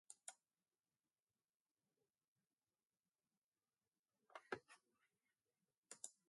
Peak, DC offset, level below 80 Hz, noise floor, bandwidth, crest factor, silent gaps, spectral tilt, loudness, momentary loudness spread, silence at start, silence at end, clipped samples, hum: -32 dBFS; under 0.1%; under -90 dBFS; under -90 dBFS; 11.5 kHz; 34 dB; 1.22-1.27 s, 1.56-1.65 s, 1.71-1.75 s, 2.24-2.36 s, 3.38-3.52 s, 3.99-4.04 s, 5.77-5.83 s; -1.5 dB/octave; -58 LUFS; 10 LU; 0.1 s; 0.2 s; under 0.1%; none